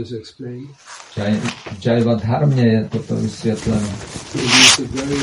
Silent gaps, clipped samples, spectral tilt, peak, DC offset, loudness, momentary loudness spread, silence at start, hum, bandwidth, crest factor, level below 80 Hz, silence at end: none; under 0.1%; -3.5 dB/octave; 0 dBFS; under 0.1%; -16 LUFS; 22 LU; 0 s; none; 11.5 kHz; 18 dB; -44 dBFS; 0 s